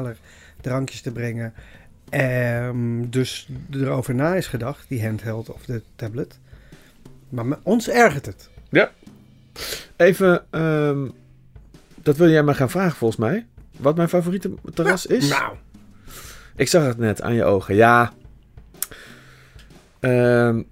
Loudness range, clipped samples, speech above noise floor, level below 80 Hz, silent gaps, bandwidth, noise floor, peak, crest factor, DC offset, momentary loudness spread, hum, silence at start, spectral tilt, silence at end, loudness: 6 LU; under 0.1%; 27 dB; -48 dBFS; none; 16 kHz; -47 dBFS; -2 dBFS; 20 dB; under 0.1%; 16 LU; none; 0 s; -6 dB/octave; 0.1 s; -21 LUFS